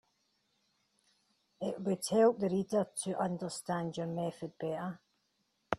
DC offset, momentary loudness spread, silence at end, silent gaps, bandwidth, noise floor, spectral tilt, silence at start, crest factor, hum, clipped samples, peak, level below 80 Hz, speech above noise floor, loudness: under 0.1%; 13 LU; 0 s; none; 13.5 kHz; -79 dBFS; -5.5 dB/octave; 1.6 s; 24 dB; none; under 0.1%; -12 dBFS; -74 dBFS; 45 dB; -35 LUFS